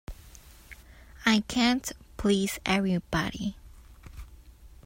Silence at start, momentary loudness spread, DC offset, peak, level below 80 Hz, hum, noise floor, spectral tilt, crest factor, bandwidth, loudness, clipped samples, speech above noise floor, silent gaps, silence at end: 0.1 s; 24 LU; under 0.1%; -8 dBFS; -48 dBFS; none; -51 dBFS; -4.5 dB/octave; 22 dB; 16 kHz; -27 LUFS; under 0.1%; 24 dB; none; 0.2 s